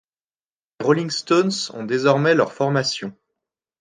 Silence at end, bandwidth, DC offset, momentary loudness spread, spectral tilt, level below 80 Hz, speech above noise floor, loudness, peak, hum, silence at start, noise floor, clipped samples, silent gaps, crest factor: 0.7 s; 10 kHz; under 0.1%; 9 LU; -5 dB/octave; -70 dBFS; over 70 dB; -20 LUFS; -4 dBFS; none; 0.8 s; under -90 dBFS; under 0.1%; none; 18 dB